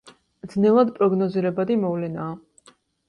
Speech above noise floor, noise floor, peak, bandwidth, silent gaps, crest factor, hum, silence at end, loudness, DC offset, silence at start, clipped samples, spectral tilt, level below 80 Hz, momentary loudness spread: 35 dB; -56 dBFS; -6 dBFS; 9.8 kHz; none; 16 dB; none; 0.7 s; -22 LUFS; under 0.1%; 0.05 s; under 0.1%; -9 dB/octave; -64 dBFS; 14 LU